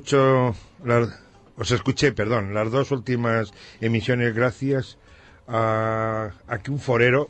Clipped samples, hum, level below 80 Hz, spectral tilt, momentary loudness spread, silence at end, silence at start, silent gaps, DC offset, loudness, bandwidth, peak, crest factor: under 0.1%; none; -50 dBFS; -6 dB/octave; 10 LU; 0 s; 0 s; none; under 0.1%; -23 LUFS; 8.6 kHz; -4 dBFS; 18 dB